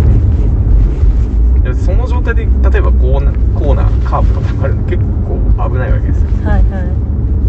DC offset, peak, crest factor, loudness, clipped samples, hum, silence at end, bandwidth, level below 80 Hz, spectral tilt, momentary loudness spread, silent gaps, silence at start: under 0.1%; 0 dBFS; 10 dB; -13 LUFS; under 0.1%; none; 0 s; 4 kHz; -10 dBFS; -9.5 dB/octave; 3 LU; none; 0 s